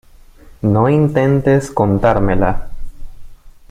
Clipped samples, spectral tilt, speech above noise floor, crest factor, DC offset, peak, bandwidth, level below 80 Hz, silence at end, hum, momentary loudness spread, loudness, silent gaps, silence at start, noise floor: under 0.1%; -8.5 dB/octave; 28 dB; 14 dB; under 0.1%; 0 dBFS; 11 kHz; -28 dBFS; 0.2 s; none; 6 LU; -14 LUFS; none; 0.65 s; -41 dBFS